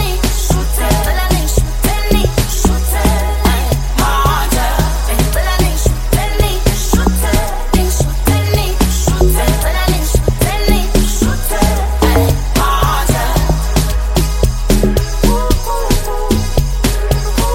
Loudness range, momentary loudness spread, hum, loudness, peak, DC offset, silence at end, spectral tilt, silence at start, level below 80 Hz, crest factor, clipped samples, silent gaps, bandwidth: 1 LU; 3 LU; none; -14 LUFS; 0 dBFS; under 0.1%; 0 s; -4.5 dB/octave; 0 s; -14 dBFS; 12 dB; under 0.1%; none; 16.5 kHz